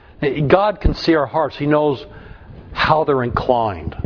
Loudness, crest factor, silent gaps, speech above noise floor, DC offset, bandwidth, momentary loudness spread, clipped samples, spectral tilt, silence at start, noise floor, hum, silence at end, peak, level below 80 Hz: -17 LUFS; 18 dB; none; 21 dB; under 0.1%; 5.4 kHz; 8 LU; under 0.1%; -7.5 dB/octave; 0.2 s; -38 dBFS; none; 0 s; 0 dBFS; -32 dBFS